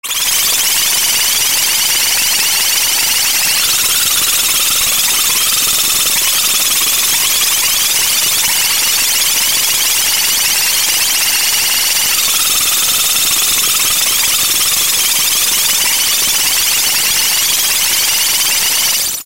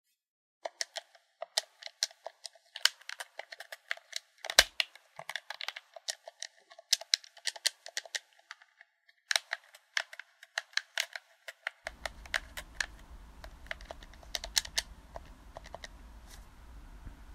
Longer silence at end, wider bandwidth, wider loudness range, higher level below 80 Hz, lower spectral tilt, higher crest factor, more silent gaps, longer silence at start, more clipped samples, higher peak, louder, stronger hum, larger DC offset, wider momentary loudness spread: about the same, 0 s vs 0 s; first, over 20 kHz vs 16 kHz; second, 0 LU vs 7 LU; first, -46 dBFS vs -56 dBFS; about the same, 2 dB/octave vs 1 dB/octave; second, 12 dB vs 38 dB; neither; second, 0.05 s vs 0.65 s; neither; about the same, 0 dBFS vs -2 dBFS; first, -9 LUFS vs -35 LUFS; neither; first, 2% vs under 0.1%; second, 0 LU vs 22 LU